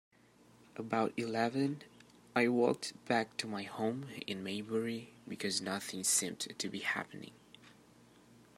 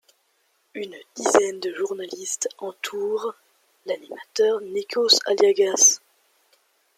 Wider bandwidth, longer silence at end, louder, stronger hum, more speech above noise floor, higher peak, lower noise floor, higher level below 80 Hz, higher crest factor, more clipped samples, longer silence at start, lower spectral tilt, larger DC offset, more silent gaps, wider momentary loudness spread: about the same, 16 kHz vs 15 kHz; second, 0.25 s vs 1 s; second, -36 LUFS vs -21 LUFS; neither; second, 28 dB vs 45 dB; second, -14 dBFS vs -2 dBFS; second, -64 dBFS vs -68 dBFS; about the same, -80 dBFS vs -76 dBFS; about the same, 24 dB vs 22 dB; neither; about the same, 0.75 s vs 0.75 s; first, -3 dB/octave vs 0 dB/octave; neither; neither; second, 15 LU vs 19 LU